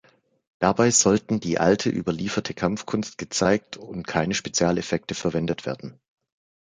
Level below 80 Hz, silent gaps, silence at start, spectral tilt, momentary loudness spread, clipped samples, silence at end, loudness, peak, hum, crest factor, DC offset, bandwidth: -52 dBFS; none; 0.6 s; -4 dB/octave; 11 LU; under 0.1%; 0.85 s; -23 LUFS; -4 dBFS; none; 20 dB; under 0.1%; 10 kHz